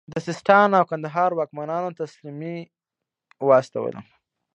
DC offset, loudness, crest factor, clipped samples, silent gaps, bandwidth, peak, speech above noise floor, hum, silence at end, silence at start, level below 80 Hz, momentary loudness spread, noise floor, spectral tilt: under 0.1%; -21 LUFS; 22 dB; under 0.1%; none; 8.6 kHz; -2 dBFS; 65 dB; none; 0.55 s; 0.1 s; -70 dBFS; 17 LU; -86 dBFS; -6.5 dB/octave